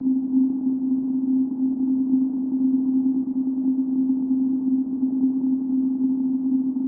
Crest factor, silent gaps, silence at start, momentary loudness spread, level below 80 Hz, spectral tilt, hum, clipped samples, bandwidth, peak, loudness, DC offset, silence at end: 10 dB; none; 0 s; 2 LU; -66 dBFS; -13.5 dB/octave; none; under 0.1%; 1.2 kHz; -10 dBFS; -23 LUFS; under 0.1%; 0 s